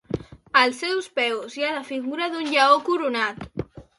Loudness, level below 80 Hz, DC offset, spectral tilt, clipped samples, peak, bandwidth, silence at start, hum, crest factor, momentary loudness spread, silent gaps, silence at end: -22 LUFS; -54 dBFS; under 0.1%; -4 dB/octave; under 0.1%; -4 dBFS; 11.5 kHz; 0.1 s; none; 20 dB; 15 LU; none; 0.15 s